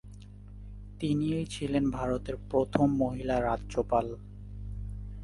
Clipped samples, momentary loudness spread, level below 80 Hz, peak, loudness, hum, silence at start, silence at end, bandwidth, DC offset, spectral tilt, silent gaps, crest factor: under 0.1%; 20 LU; -44 dBFS; -10 dBFS; -31 LUFS; 50 Hz at -40 dBFS; 0.05 s; 0 s; 11.5 kHz; under 0.1%; -7 dB/octave; none; 22 dB